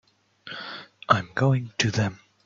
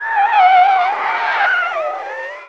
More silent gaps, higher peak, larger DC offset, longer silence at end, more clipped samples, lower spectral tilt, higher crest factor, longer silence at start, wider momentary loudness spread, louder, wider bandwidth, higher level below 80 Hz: neither; about the same, -4 dBFS vs -2 dBFS; second, under 0.1% vs 0.2%; first, 0.3 s vs 0 s; neither; first, -5 dB/octave vs -1 dB/octave; first, 22 dB vs 12 dB; first, 0.45 s vs 0 s; about the same, 15 LU vs 13 LU; second, -24 LUFS vs -14 LUFS; about the same, 7.6 kHz vs 7 kHz; first, -62 dBFS vs -68 dBFS